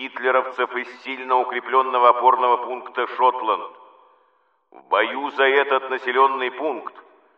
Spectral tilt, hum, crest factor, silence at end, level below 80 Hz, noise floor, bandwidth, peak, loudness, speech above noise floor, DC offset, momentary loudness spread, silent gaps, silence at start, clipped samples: -4 dB/octave; none; 20 dB; 0.35 s; under -90 dBFS; -64 dBFS; 6.4 kHz; -2 dBFS; -20 LUFS; 43 dB; under 0.1%; 12 LU; none; 0 s; under 0.1%